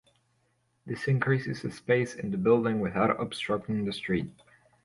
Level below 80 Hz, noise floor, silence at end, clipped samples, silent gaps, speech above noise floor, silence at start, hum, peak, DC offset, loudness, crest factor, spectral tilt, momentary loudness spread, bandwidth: -60 dBFS; -72 dBFS; 0.55 s; under 0.1%; none; 44 dB; 0.85 s; none; -10 dBFS; under 0.1%; -29 LUFS; 18 dB; -7 dB/octave; 10 LU; 11.5 kHz